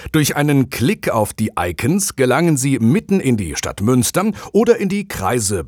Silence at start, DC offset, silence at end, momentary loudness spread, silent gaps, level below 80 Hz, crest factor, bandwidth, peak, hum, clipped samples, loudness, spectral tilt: 0 s; under 0.1%; 0 s; 5 LU; none; -44 dBFS; 16 dB; over 20 kHz; 0 dBFS; none; under 0.1%; -17 LUFS; -5 dB/octave